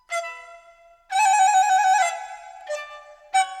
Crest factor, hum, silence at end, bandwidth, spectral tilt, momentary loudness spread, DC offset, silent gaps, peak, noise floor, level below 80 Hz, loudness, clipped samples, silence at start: 14 dB; none; 0 s; 14 kHz; 4.5 dB/octave; 21 LU; under 0.1%; none; -8 dBFS; -52 dBFS; -70 dBFS; -20 LUFS; under 0.1%; 0.1 s